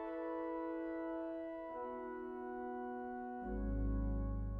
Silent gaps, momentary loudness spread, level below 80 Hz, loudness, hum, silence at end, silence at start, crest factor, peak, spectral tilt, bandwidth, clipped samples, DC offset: none; 6 LU; -46 dBFS; -43 LUFS; none; 0 s; 0 s; 12 dB; -30 dBFS; -8.5 dB/octave; 3.5 kHz; under 0.1%; under 0.1%